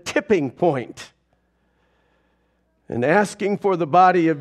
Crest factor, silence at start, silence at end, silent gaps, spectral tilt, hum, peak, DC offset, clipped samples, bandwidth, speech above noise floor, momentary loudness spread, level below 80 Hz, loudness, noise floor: 18 dB; 0.05 s; 0 s; none; -6 dB/octave; none; -2 dBFS; under 0.1%; under 0.1%; 12.5 kHz; 47 dB; 15 LU; -62 dBFS; -19 LUFS; -66 dBFS